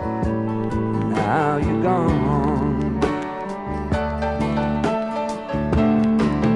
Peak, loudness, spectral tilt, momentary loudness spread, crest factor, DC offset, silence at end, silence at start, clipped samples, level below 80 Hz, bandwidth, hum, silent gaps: -6 dBFS; -21 LUFS; -8 dB/octave; 7 LU; 14 dB; under 0.1%; 0 s; 0 s; under 0.1%; -36 dBFS; 11 kHz; none; none